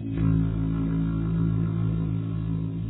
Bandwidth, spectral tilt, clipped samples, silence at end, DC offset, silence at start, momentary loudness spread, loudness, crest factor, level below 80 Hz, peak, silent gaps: 4 kHz; -13 dB/octave; under 0.1%; 0 s; under 0.1%; 0 s; 5 LU; -26 LUFS; 12 dB; -36 dBFS; -12 dBFS; none